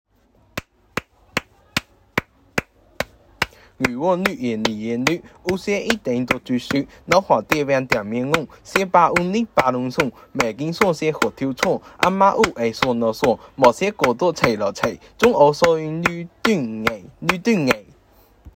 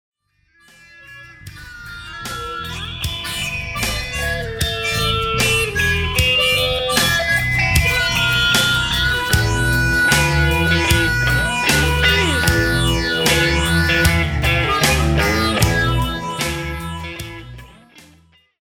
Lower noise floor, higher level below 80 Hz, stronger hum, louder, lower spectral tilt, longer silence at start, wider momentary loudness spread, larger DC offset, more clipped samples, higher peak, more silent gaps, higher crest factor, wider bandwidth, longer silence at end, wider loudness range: about the same, -57 dBFS vs -59 dBFS; second, -50 dBFS vs -28 dBFS; neither; second, -20 LUFS vs -16 LUFS; first, -5 dB/octave vs -3.5 dB/octave; second, 0.55 s vs 1 s; about the same, 11 LU vs 13 LU; neither; neither; about the same, 0 dBFS vs -2 dBFS; neither; about the same, 20 dB vs 16 dB; second, 16.5 kHz vs 19.5 kHz; second, 0.05 s vs 0.6 s; second, 6 LU vs 9 LU